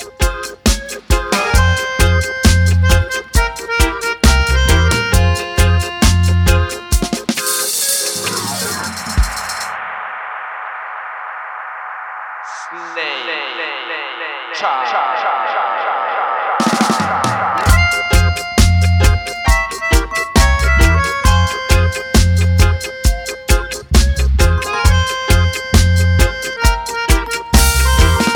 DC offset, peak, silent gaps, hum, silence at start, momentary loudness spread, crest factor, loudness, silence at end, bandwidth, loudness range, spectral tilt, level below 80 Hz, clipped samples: under 0.1%; 0 dBFS; none; none; 0 s; 12 LU; 14 dB; -15 LUFS; 0 s; 19 kHz; 9 LU; -4 dB/octave; -18 dBFS; under 0.1%